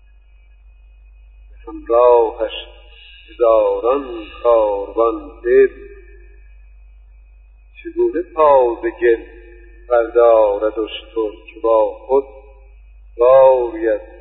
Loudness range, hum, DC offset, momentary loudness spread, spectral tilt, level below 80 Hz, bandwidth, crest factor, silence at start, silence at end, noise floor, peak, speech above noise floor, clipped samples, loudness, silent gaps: 4 LU; none; under 0.1%; 13 LU; -10 dB/octave; -42 dBFS; 4.1 kHz; 16 dB; 1.65 s; 0.15 s; -46 dBFS; 0 dBFS; 31 dB; under 0.1%; -15 LUFS; none